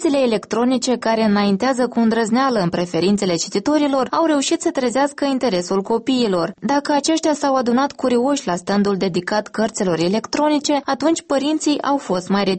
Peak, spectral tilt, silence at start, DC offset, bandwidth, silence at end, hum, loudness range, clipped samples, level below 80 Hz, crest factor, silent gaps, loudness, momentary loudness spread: -6 dBFS; -4.5 dB/octave; 0 s; under 0.1%; 8.8 kHz; 0 s; none; 1 LU; under 0.1%; -56 dBFS; 12 dB; none; -18 LUFS; 3 LU